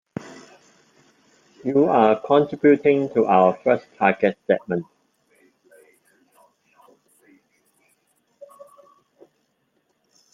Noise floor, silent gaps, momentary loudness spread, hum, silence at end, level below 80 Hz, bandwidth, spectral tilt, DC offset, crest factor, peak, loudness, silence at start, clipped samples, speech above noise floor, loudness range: -69 dBFS; none; 13 LU; none; 5.5 s; -70 dBFS; 7.4 kHz; -7.5 dB/octave; under 0.1%; 20 dB; -2 dBFS; -19 LUFS; 0.25 s; under 0.1%; 51 dB; 11 LU